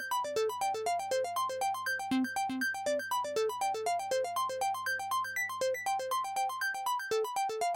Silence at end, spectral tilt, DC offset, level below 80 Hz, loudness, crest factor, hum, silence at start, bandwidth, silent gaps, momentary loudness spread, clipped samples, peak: 0 s; -2 dB/octave; under 0.1%; -78 dBFS; -33 LUFS; 10 dB; none; 0 s; 16.5 kHz; none; 2 LU; under 0.1%; -24 dBFS